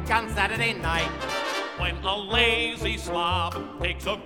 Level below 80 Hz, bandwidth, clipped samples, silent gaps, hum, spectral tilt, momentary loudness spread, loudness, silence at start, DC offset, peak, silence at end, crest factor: -38 dBFS; 17.5 kHz; under 0.1%; none; none; -4 dB/octave; 8 LU; -25 LUFS; 0 s; under 0.1%; -6 dBFS; 0 s; 20 dB